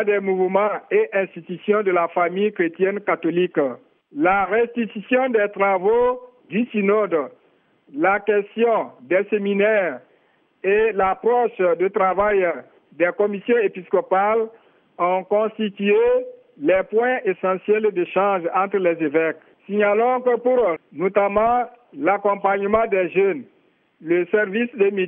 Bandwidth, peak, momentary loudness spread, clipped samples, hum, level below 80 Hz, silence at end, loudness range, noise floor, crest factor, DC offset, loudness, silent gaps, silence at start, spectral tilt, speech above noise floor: 3.7 kHz; -4 dBFS; 7 LU; under 0.1%; none; -56 dBFS; 0 s; 2 LU; -61 dBFS; 18 dB; under 0.1%; -20 LUFS; none; 0 s; -9.5 dB/octave; 41 dB